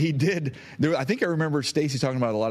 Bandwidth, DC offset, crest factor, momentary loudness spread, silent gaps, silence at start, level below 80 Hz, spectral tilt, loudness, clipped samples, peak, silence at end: 14 kHz; under 0.1%; 14 dB; 3 LU; none; 0 s; -62 dBFS; -6 dB/octave; -25 LUFS; under 0.1%; -10 dBFS; 0 s